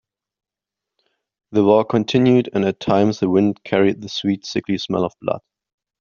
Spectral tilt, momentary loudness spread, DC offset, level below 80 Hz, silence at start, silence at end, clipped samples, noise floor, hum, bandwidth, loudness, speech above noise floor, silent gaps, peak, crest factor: -6.5 dB/octave; 8 LU; under 0.1%; -58 dBFS; 1.5 s; 0.6 s; under 0.1%; -86 dBFS; none; 7.2 kHz; -19 LUFS; 68 dB; none; -2 dBFS; 16 dB